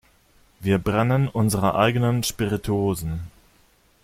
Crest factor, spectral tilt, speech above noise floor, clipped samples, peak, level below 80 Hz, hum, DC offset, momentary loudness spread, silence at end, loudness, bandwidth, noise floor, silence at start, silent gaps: 18 dB; -6 dB/octave; 37 dB; under 0.1%; -6 dBFS; -46 dBFS; none; under 0.1%; 11 LU; 0.75 s; -22 LUFS; 16 kHz; -59 dBFS; 0.6 s; none